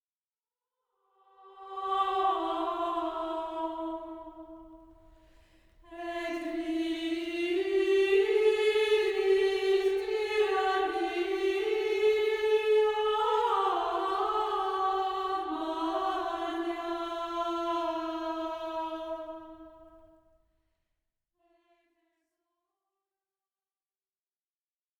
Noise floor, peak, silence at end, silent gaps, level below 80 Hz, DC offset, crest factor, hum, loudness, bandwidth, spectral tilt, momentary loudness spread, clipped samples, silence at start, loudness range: under -90 dBFS; -16 dBFS; 5 s; none; -64 dBFS; under 0.1%; 16 dB; none; -30 LUFS; 12.5 kHz; -3.5 dB/octave; 12 LU; under 0.1%; 1.45 s; 12 LU